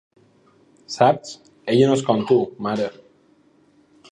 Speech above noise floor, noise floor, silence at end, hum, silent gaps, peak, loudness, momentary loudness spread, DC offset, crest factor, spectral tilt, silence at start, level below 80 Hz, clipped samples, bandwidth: 38 dB; -57 dBFS; 1.2 s; none; none; -2 dBFS; -20 LUFS; 16 LU; under 0.1%; 20 dB; -6 dB/octave; 0.9 s; -64 dBFS; under 0.1%; 10.5 kHz